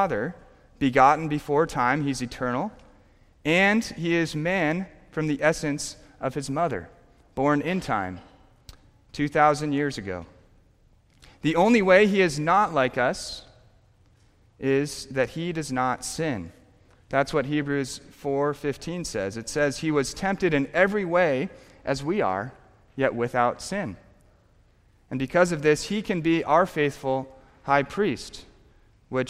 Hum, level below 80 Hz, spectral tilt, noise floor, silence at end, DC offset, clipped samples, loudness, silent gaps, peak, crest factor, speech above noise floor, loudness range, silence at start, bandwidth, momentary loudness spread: none; -52 dBFS; -5.5 dB/octave; -59 dBFS; 0 s; under 0.1%; under 0.1%; -25 LUFS; none; -4 dBFS; 22 dB; 35 dB; 6 LU; 0 s; 15.5 kHz; 14 LU